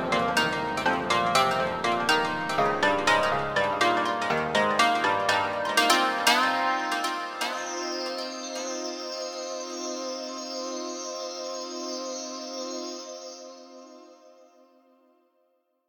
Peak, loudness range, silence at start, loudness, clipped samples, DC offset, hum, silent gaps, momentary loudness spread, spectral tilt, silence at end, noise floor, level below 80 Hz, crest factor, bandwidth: -6 dBFS; 13 LU; 0 s; -26 LUFS; under 0.1%; under 0.1%; none; none; 12 LU; -2.5 dB/octave; 1.55 s; -71 dBFS; -60 dBFS; 20 dB; 18 kHz